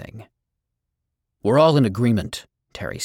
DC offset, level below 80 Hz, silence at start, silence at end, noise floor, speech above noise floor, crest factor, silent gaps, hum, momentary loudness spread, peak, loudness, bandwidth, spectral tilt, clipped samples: under 0.1%; -52 dBFS; 0 s; 0 s; -80 dBFS; 61 dB; 18 dB; none; none; 18 LU; -4 dBFS; -19 LUFS; 16.5 kHz; -6.5 dB/octave; under 0.1%